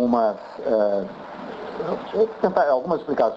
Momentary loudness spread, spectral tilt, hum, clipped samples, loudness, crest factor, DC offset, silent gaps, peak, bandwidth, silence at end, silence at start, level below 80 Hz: 14 LU; -8 dB/octave; none; under 0.1%; -23 LUFS; 18 dB; under 0.1%; none; -4 dBFS; 7.2 kHz; 0 s; 0 s; -60 dBFS